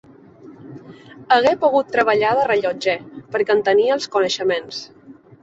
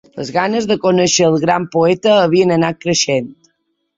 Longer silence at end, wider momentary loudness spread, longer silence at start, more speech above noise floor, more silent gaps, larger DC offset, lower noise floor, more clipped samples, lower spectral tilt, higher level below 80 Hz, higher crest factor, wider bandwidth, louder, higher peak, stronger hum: second, 0.3 s vs 0.65 s; first, 16 LU vs 6 LU; first, 0.45 s vs 0.15 s; second, 25 dB vs 53 dB; neither; neither; second, -43 dBFS vs -67 dBFS; neither; about the same, -4 dB/octave vs -4 dB/octave; second, -62 dBFS vs -54 dBFS; about the same, 18 dB vs 14 dB; about the same, 8 kHz vs 7.8 kHz; second, -18 LUFS vs -14 LUFS; about the same, -2 dBFS vs 0 dBFS; neither